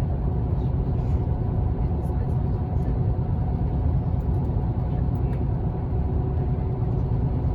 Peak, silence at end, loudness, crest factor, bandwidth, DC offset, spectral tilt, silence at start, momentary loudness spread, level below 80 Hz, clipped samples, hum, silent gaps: -12 dBFS; 0 s; -25 LUFS; 12 dB; 4.5 kHz; under 0.1%; -11.5 dB/octave; 0 s; 1 LU; -28 dBFS; under 0.1%; none; none